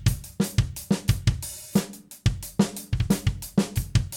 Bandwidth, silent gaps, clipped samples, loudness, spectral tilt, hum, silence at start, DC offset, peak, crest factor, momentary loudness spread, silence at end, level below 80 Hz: 18 kHz; none; under 0.1%; -27 LUFS; -5.5 dB/octave; none; 0 s; under 0.1%; -6 dBFS; 18 dB; 4 LU; 0 s; -34 dBFS